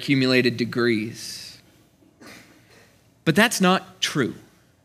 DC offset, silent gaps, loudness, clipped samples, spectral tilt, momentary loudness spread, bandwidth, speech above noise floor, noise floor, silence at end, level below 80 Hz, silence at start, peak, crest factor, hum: under 0.1%; none; -21 LUFS; under 0.1%; -4.5 dB/octave; 16 LU; 16 kHz; 35 dB; -57 dBFS; 0.45 s; -68 dBFS; 0 s; 0 dBFS; 24 dB; none